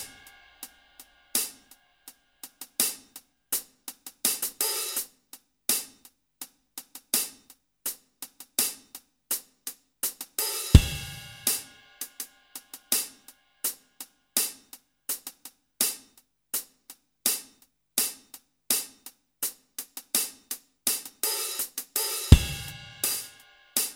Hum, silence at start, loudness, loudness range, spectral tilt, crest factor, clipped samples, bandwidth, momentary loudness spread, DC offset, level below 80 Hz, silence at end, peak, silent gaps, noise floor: none; 0 s; -28 LUFS; 6 LU; -3 dB/octave; 30 dB; under 0.1%; 17.5 kHz; 18 LU; under 0.1%; -36 dBFS; 0 s; 0 dBFS; none; -63 dBFS